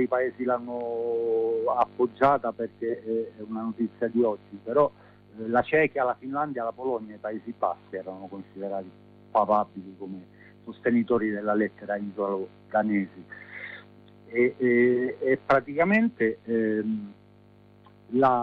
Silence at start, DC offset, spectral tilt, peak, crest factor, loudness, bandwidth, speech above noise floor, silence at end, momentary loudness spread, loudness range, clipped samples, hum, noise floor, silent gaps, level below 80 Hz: 0 s; under 0.1%; -9 dB/octave; -10 dBFS; 16 dB; -27 LUFS; 5.6 kHz; 29 dB; 0 s; 16 LU; 6 LU; under 0.1%; 50 Hz at -55 dBFS; -55 dBFS; none; -66 dBFS